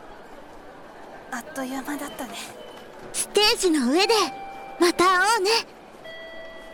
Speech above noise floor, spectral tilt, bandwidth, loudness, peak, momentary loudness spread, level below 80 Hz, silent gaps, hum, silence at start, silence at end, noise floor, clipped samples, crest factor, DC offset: 21 dB; -1.5 dB/octave; 17.5 kHz; -22 LUFS; -8 dBFS; 24 LU; -54 dBFS; none; none; 0 s; 0 s; -43 dBFS; under 0.1%; 18 dB; under 0.1%